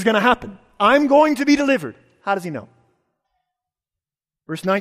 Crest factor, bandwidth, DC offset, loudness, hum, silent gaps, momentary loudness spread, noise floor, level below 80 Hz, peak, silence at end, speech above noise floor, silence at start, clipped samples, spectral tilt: 16 dB; 15 kHz; under 0.1%; -17 LUFS; none; none; 18 LU; -89 dBFS; -54 dBFS; -2 dBFS; 0 s; 72 dB; 0 s; under 0.1%; -5 dB/octave